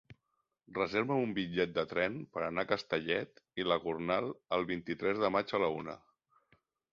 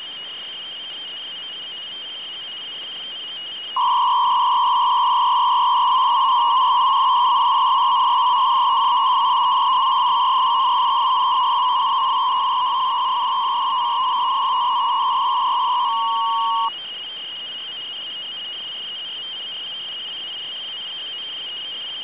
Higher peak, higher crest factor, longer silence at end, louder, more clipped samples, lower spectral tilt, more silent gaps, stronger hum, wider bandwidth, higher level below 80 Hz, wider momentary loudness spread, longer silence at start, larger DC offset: second, -14 dBFS vs -10 dBFS; first, 22 dB vs 10 dB; first, 0.95 s vs 0 s; second, -34 LUFS vs -19 LUFS; neither; about the same, -3.5 dB/octave vs -4 dB/octave; neither; neither; first, 7.2 kHz vs 4 kHz; about the same, -68 dBFS vs -72 dBFS; second, 7 LU vs 12 LU; about the same, 0.1 s vs 0 s; second, under 0.1% vs 0.1%